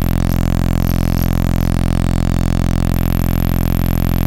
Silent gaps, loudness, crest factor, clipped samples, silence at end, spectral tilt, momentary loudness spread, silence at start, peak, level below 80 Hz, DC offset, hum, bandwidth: none; -17 LUFS; 10 dB; under 0.1%; 0 s; -7 dB/octave; 0 LU; 0 s; -4 dBFS; -18 dBFS; under 0.1%; none; 17 kHz